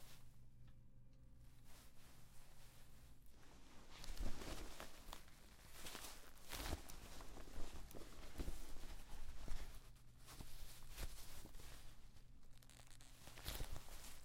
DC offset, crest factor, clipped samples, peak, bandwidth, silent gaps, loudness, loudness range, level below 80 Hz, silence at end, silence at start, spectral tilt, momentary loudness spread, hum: under 0.1%; 20 dB; under 0.1%; -30 dBFS; 16 kHz; none; -57 LUFS; 10 LU; -54 dBFS; 0 s; 0 s; -3.5 dB/octave; 15 LU; none